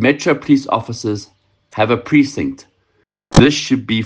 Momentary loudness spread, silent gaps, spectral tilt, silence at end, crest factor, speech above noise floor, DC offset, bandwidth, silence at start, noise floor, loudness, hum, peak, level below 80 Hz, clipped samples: 13 LU; none; -5.5 dB/octave; 0 s; 16 dB; 48 dB; under 0.1%; 9.4 kHz; 0 s; -63 dBFS; -15 LUFS; none; 0 dBFS; -36 dBFS; under 0.1%